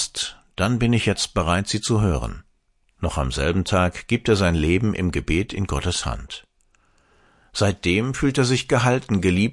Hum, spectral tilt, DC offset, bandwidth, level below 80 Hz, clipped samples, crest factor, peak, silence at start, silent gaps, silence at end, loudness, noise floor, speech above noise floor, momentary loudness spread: none; -5 dB/octave; under 0.1%; 11.5 kHz; -36 dBFS; under 0.1%; 18 dB; -4 dBFS; 0 s; none; 0 s; -22 LUFS; -64 dBFS; 43 dB; 9 LU